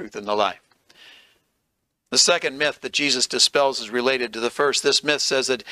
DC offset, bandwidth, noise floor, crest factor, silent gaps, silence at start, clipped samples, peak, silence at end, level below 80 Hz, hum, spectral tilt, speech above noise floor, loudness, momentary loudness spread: under 0.1%; 15.5 kHz; -75 dBFS; 22 dB; none; 0 s; under 0.1%; -2 dBFS; 0 s; -68 dBFS; none; -1 dB/octave; 54 dB; -20 LUFS; 6 LU